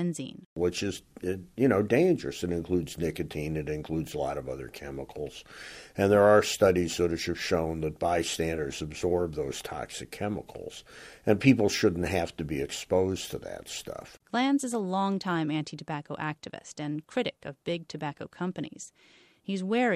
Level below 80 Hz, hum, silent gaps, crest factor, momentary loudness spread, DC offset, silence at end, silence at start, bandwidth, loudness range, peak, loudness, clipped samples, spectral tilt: -54 dBFS; none; 0.46-0.56 s; 22 dB; 16 LU; under 0.1%; 0 s; 0 s; 15 kHz; 8 LU; -8 dBFS; -29 LUFS; under 0.1%; -5.5 dB/octave